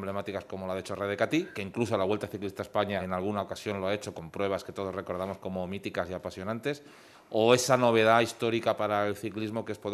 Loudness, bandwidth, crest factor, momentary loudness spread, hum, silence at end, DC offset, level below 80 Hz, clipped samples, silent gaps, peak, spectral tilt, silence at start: -30 LUFS; 13.5 kHz; 24 dB; 13 LU; none; 0 s; under 0.1%; -70 dBFS; under 0.1%; none; -6 dBFS; -5 dB/octave; 0 s